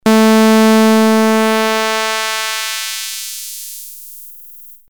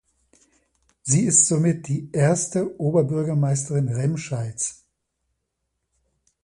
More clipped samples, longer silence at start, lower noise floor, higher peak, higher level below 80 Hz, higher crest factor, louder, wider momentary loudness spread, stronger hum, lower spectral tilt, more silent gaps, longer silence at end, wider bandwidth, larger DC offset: neither; second, 0.05 s vs 1.05 s; second, -38 dBFS vs -78 dBFS; first, 0 dBFS vs -4 dBFS; about the same, -64 dBFS vs -60 dBFS; second, 14 dB vs 20 dB; first, -12 LUFS vs -21 LUFS; first, 21 LU vs 12 LU; neither; second, -3.5 dB/octave vs -5.5 dB/octave; neither; second, 0.15 s vs 1.7 s; first, over 20 kHz vs 11.5 kHz; neither